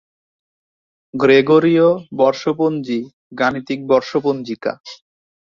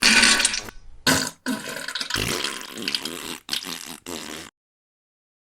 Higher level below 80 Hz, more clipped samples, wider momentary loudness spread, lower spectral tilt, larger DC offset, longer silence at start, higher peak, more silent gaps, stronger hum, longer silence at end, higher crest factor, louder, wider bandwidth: second, -60 dBFS vs -48 dBFS; neither; second, 14 LU vs 17 LU; first, -6.5 dB/octave vs -1 dB/octave; neither; first, 1.15 s vs 0 s; about the same, -2 dBFS vs 0 dBFS; first, 3.13-3.30 s, 4.80-4.84 s vs none; neither; second, 0.55 s vs 1.1 s; second, 16 dB vs 26 dB; first, -17 LUFS vs -23 LUFS; second, 7.2 kHz vs over 20 kHz